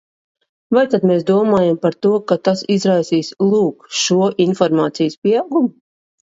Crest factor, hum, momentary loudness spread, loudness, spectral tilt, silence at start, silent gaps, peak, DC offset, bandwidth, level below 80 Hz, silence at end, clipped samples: 16 dB; none; 4 LU; -16 LUFS; -5.5 dB/octave; 0.7 s; 5.18-5.22 s; 0 dBFS; under 0.1%; 7.8 kHz; -62 dBFS; 0.7 s; under 0.1%